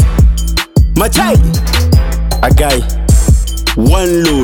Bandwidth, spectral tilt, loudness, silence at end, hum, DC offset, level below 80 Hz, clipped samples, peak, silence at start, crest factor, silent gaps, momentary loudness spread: 18.5 kHz; -5 dB/octave; -11 LUFS; 0 s; none; under 0.1%; -12 dBFS; under 0.1%; 0 dBFS; 0 s; 8 dB; none; 4 LU